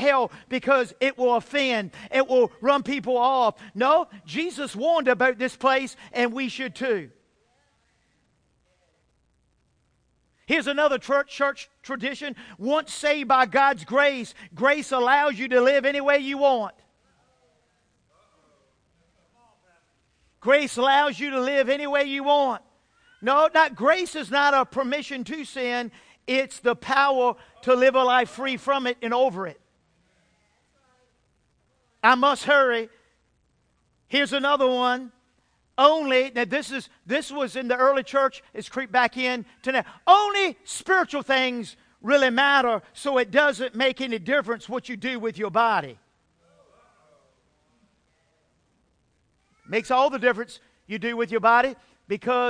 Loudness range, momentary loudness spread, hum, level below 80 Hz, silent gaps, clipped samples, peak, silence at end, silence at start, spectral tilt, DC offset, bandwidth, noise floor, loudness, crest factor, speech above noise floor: 7 LU; 11 LU; none; -66 dBFS; none; under 0.1%; -2 dBFS; 0 s; 0 s; -3.5 dB/octave; under 0.1%; 10.5 kHz; -68 dBFS; -23 LUFS; 22 dB; 45 dB